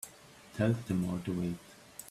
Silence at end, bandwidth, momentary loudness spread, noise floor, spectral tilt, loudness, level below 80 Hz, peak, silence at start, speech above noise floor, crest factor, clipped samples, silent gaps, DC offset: 0 s; 15.5 kHz; 17 LU; -55 dBFS; -6.5 dB/octave; -34 LUFS; -62 dBFS; -16 dBFS; 0.05 s; 23 dB; 18 dB; under 0.1%; none; under 0.1%